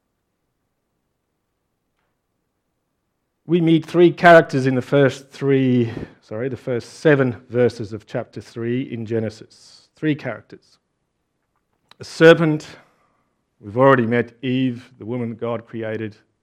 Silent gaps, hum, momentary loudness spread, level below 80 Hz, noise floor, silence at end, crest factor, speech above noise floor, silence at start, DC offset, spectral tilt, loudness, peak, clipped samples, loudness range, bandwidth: none; none; 17 LU; -62 dBFS; -73 dBFS; 0.3 s; 20 dB; 55 dB; 3.5 s; under 0.1%; -7 dB/octave; -18 LUFS; 0 dBFS; under 0.1%; 11 LU; 11.5 kHz